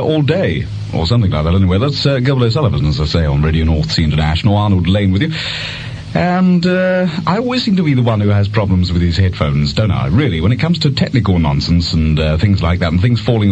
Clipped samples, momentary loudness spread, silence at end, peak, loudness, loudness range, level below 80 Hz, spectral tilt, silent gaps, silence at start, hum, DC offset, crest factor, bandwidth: under 0.1%; 3 LU; 0 s; 0 dBFS; -14 LUFS; 1 LU; -26 dBFS; -7.5 dB/octave; none; 0 s; none; under 0.1%; 12 dB; 8.4 kHz